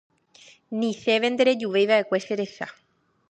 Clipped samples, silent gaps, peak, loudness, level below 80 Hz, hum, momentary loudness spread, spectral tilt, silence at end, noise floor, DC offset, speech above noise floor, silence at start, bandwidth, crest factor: under 0.1%; none; -6 dBFS; -23 LUFS; -76 dBFS; none; 13 LU; -4.5 dB/octave; 0.6 s; -54 dBFS; under 0.1%; 31 dB; 0.7 s; 8.8 kHz; 18 dB